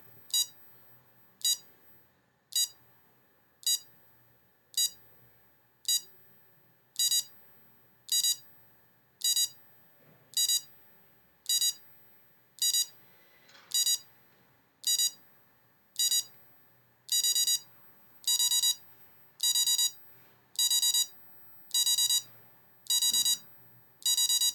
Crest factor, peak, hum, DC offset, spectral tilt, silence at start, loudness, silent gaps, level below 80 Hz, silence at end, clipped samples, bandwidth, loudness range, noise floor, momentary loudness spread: 16 dB; -18 dBFS; none; under 0.1%; 4 dB/octave; 0.35 s; -28 LUFS; none; -84 dBFS; 0 s; under 0.1%; 18.5 kHz; 6 LU; -68 dBFS; 11 LU